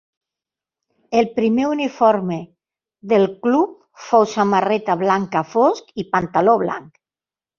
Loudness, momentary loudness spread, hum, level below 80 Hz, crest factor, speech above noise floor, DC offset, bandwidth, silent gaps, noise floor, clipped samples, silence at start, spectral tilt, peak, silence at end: -18 LUFS; 8 LU; none; -60 dBFS; 18 dB; over 72 dB; under 0.1%; 7.2 kHz; none; under -90 dBFS; under 0.1%; 1.1 s; -6.5 dB/octave; -2 dBFS; 0.75 s